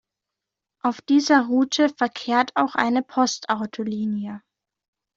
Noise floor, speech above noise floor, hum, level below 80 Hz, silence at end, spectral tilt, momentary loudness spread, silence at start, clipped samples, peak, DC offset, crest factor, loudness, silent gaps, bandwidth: -86 dBFS; 64 dB; none; -68 dBFS; 0.8 s; -3.5 dB/octave; 10 LU; 0.85 s; under 0.1%; -4 dBFS; under 0.1%; 20 dB; -22 LUFS; none; 7.8 kHz